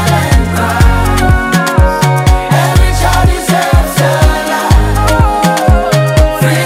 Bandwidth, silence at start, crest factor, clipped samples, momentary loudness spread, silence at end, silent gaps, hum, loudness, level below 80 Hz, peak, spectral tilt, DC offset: 16.5 kHz; 0 s; 8 dB; 2%; 1 LU; 0 s; none; none; -10 LUFS; -14 dBFS; 0 dBFS; -5.5 dB/octave; under 0.1%